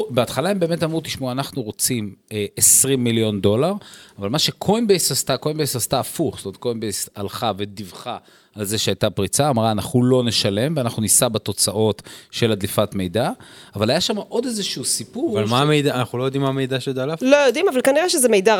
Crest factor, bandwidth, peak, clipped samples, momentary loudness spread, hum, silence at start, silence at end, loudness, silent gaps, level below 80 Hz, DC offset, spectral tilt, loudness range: 20 dB; 19 kHz; 0 dBFS; under 0.1%; 12 LU; none; 0 s; 0 s; -19 LUFS; none; -56 dBFS; under 0.1%; -3.5 dB/octave; 5 LU